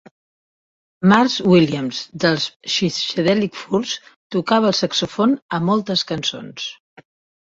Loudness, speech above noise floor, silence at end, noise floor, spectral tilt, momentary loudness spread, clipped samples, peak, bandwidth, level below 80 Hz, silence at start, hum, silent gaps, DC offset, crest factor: -19 LUFS; over 72 dB; 0.65 s; under -90 dBFS; -5 dB/octave; 12 LU; under 0.1%; -2 dBFS; 7.8 kHz; -58 dBFS; 1 s; none; 2.56-2.60 s, 4.16-4.30 s, 5.42-5.49 s; under 0.1%; 18 dB